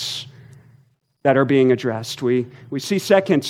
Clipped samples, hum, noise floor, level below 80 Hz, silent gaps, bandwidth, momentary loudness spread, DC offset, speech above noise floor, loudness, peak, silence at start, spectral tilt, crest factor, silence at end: under 0.1%; none; -57 dBFS; -68 dBFS; none; 16 kHz; 13 LU; under 0.1%; 39 dB; -19 LUFS; -2 dBFS; 0 s; -5.5 dB/octave; 18 dB; 0 s